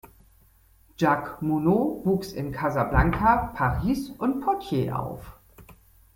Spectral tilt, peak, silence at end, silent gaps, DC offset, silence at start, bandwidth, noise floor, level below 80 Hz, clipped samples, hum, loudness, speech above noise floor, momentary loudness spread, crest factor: -7.5 dB/octave; -6 dBFS; 0.45 s; none; under 0.1%; 0.05 s; 17 kHz; -58 dBFS; -38 dBFS; under 0.1%; none; -25 LUFS; 34 dB; 7 LU; 20 dB